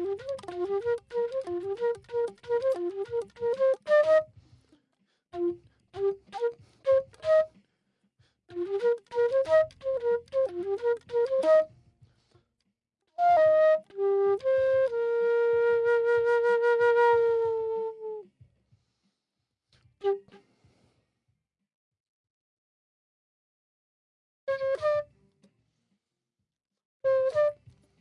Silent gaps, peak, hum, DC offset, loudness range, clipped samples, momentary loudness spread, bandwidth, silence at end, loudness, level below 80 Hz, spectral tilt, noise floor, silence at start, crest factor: 21.74-21.91 s, 22.00-22.24 s, 22.30-24.47 s, 26.85-27.00 s; -14 dBFS; none; under 0.1%; 15 LU; under 0.1%; 12 LU; 10.5 kHz; 0.5 s; -27 LUFS; -70 dBFS; -5.5 dB/octave; -86 dBFS; 0 s; 16 dB